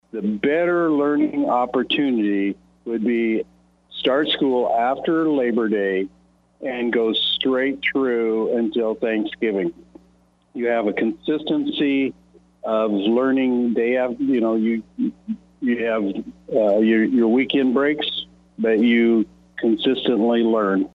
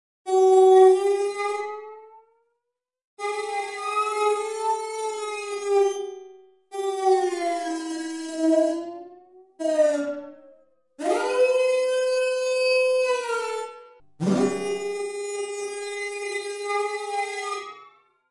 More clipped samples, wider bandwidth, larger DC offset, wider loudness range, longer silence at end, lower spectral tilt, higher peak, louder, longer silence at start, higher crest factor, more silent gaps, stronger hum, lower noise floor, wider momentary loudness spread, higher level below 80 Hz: neither; second, 5 kHz vs 11.5 kHz; neither; about the same, 4 LU vs 6 LU; second, 0.05 s vs 0.45 s; first, -7.5 dB/octave vs -4.5 dB/octave; about the same, -6 dBFS vs -6 dBFS; first, -20 LUFS vs -24 LUFS; about the same, 0.15 s vs 0.25 s; about the same, 14 dB vs 18 dB; second, none vs 3.04-3.17 s; neither; second, -58 dBFS vs -82 dBFS; second, 9 LU vs 12 LU; first, -58 dBFS vs -82 dBFS